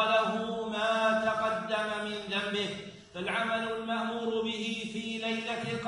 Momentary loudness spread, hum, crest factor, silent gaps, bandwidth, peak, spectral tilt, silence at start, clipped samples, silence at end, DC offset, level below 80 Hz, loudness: 8 LU; none; 16 dB; none; 10.5 kHz; -16 dBFS; -4 dB/octave; 0 s; under 0.1%; 0 s; under 0.1%; -68 dBFS; -31 LUFS